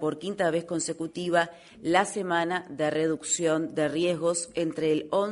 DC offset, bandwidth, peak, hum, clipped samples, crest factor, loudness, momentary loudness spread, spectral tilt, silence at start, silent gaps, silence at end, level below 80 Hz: under 0.1%; 11 kHz; -8 dBFS; none; under 0.1%; 20 dB; -27 LUFS; 6 LU; -4 dB/octave; 0 s; none; 0 s; -68 dBFS